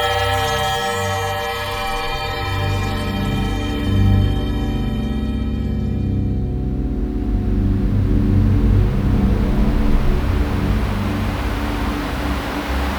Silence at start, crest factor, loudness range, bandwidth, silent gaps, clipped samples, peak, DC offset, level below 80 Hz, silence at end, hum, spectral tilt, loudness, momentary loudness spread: 0 s; 16 dB; 3 LU; over 20 kHz; none; under 0.1%; -2 dBFS; under 0.1%; -22 dBFS; 0 s; none; -6 dB/octave; -20 LUFS; 6 LU